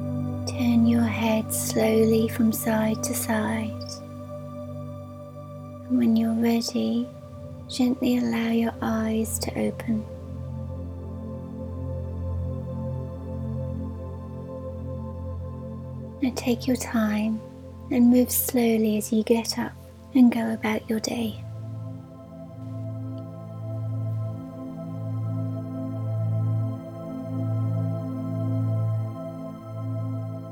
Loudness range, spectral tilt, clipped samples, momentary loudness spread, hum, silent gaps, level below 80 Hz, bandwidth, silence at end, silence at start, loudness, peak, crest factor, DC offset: 10 LU; -6 dB/octave; under 0.1%; 16 LU; none; none; -50 dBFS; 18 kHz; 0 s; 0 s; -26 LUFS; -8 dBFS; 18 dB; under 0.1%